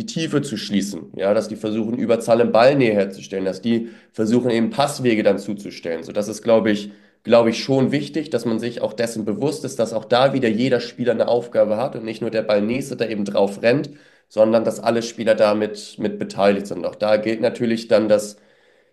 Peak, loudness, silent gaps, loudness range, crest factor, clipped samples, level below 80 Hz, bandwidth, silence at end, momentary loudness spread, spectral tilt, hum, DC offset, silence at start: -2 dBFS; -20 LUFS; none; 2 LU; 18 dB; under 0.1%; -64 dBFS; 12.5 kHz; 0.6 s; 9 LU; -5.5 dB/octave; none; under 0.1%; 0 s